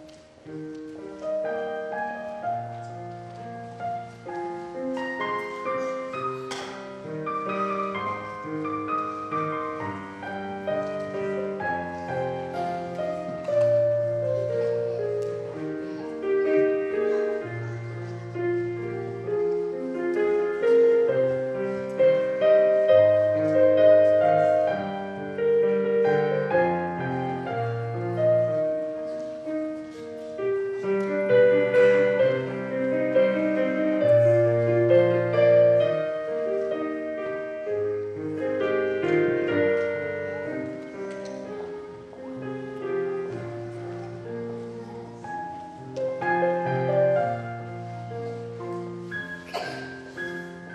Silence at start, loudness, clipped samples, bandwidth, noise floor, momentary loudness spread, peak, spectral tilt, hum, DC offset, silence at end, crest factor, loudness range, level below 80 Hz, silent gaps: 0 s; -25 LUFS; under 0.1%; 9.2 kHz; -46 dBFS; 16 LU; -8 dBFS; -7.5 dB/octave; none; under 0.1%; 0 s; 18 dB; 12 LU; -66 dBFS; none